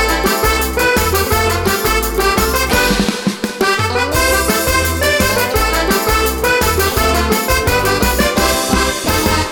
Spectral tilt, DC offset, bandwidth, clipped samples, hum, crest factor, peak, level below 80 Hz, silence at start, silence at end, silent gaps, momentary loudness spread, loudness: -3.5 dB/octave; under 0.1%; 19.5 kHz; under 0.1%; none; 14 dB; 0 dBFS; -24 dBFS; 0 s; 0 s; none; 2 LU; -14 LUFS